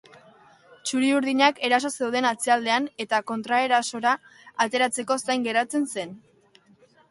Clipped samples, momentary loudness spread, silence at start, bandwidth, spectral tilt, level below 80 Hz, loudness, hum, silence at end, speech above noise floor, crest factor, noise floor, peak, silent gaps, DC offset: under 0.1%; 8 LU; 0.85 s; 11.5 kHz; -2 dB/octave; -74 dBFS; -24 LUFS; none; 0.9 s; 34 dB; 20 dB; -58 dBFS; -6 dBFS; none; under 0.1%